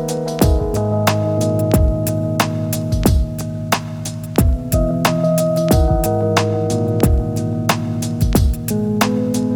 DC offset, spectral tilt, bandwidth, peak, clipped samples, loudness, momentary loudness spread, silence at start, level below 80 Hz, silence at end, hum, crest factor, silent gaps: under 0.1%; -6 dB/octave; over 20 kHz; 0 dBFS; under 0.1%; -17 LUFS; 5 LU; 0 s; -24 dBFS; 0 s; none; 16 dB; none